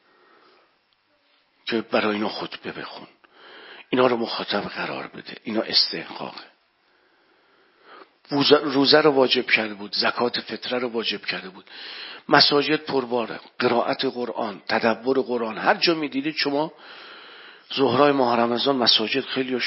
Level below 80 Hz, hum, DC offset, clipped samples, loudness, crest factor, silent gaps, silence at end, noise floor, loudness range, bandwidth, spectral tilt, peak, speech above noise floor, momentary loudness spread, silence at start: -70 dBFS; none; under 0.1%; under 0.1%; -22 LUFS; 24 dB; none; 0 s; -66 dBFS; 7 LU; 5.8 kHz; -7.5 dB/octave; 0 dBFS; 43 dB; 19 LU; 1.65 s